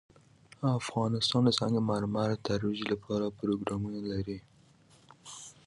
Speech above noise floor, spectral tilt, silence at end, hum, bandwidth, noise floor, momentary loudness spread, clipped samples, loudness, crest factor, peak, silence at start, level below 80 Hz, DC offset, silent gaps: 31 dB; -6 dB/octave; 0.15 s; none; 11.5 kHz; -61 dBFS; 16 LU; under 0.1%; -31 LUFS; 20 dB; -12 dBFS; 0.6 s; -58 dBFS; under 0.1%; none